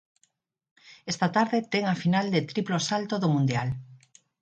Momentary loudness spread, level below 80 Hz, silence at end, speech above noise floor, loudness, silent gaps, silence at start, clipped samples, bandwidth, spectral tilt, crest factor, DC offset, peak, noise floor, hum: 9 LU; -64 dBFS; 0.45 s; 45 dB; -26 LUFS; none; 0.85 s; under 0.1%; 9.2 kHz; -5.5 dB/octave; 20 dB; under 0.1%; -8 dBFS; -71 dBFS; none